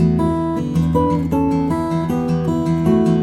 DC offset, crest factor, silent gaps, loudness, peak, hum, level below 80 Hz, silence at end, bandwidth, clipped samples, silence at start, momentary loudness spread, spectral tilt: under 0.1%; 12 dB; none; -18 LUFS; -4 dBFS; none; -36 dBFS; 0 s; 12.5 kHz; under 0.1%; 0 s; 4 LU; -9 dB/octave